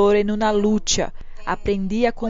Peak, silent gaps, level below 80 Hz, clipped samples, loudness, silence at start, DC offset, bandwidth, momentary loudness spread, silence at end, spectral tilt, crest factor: -4 dBFS; none; -34 dBFS; under 0.1%; -21 LUFS; 0 s; under 0.1%; 7.6 kHz; 10 LU; 0 s; -4 dB/octave; 14 dB